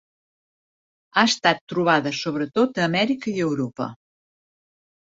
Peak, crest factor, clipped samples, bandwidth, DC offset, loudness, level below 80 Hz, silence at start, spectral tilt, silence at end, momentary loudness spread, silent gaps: -2 dBFS; 22 dB; under 0.1%; 7.8 kHz; under 0.1%; -22 LUFS; -66 dBFS; 1.15 s; -4.5 dB/octave; 1.1 s; 8 LU; 1.61-1.67 s